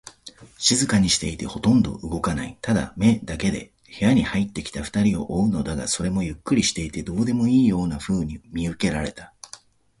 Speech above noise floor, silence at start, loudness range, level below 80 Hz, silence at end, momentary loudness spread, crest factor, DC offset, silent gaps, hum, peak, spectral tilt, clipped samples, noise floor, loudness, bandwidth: 26 dB; 0.05 s; 2 LU; -42 dBFS; 0.45 s; 11 LU; 18 dB; under 0.1%; none; none; -6 dBFS; -4.5 dB/octave; under 0.1%; -48 dBFS; -23 LUFS; 11.5 kHz